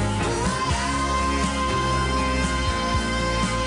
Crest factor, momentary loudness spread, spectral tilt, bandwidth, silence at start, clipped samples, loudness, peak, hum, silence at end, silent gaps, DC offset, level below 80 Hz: 12 dB; 1 LU; -4.5 dB/octave; 10.5 kHz; 0 s; under 0.1%; -23 LUFS; -12 dBFS; none; 0 s; none; under 0.1%; -30 dBFS